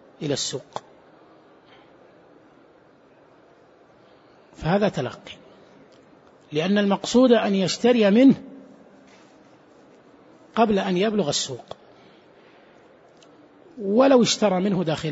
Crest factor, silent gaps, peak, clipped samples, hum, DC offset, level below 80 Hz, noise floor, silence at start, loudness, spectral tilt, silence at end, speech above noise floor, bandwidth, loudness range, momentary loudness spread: 20 dB; none; -4 dBFS; under 0.1%; none; under 0.1%; -60 dBFS; -54 dBFS; 0.2 s; -21 LUFS; -5 dB/octave; 0 s; 34 dB; 8 kHz; 10 LU; 22 LU